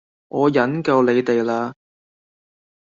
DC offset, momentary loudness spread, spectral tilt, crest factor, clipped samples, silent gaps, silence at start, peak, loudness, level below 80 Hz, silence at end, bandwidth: under 0.1%; 10 LU; -7 dB/octave; 16 dB; under 0.1%; none; 0.35 s; -4 dBFS; -19 LUFS; -64 dBFS; 1.1 s; 7.4 kHz